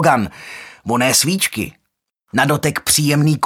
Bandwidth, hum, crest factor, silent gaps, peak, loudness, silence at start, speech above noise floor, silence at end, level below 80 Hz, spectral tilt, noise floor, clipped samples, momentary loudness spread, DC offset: 17 kHz; none; 18 dB; none; 0 dBFS; -16 LUFS; 0 s; 55 dB; 0 s; -50 dBFS; -3.5 dB/octave; -71 dBFS; under 0.1%; 16 LU; under 0.1%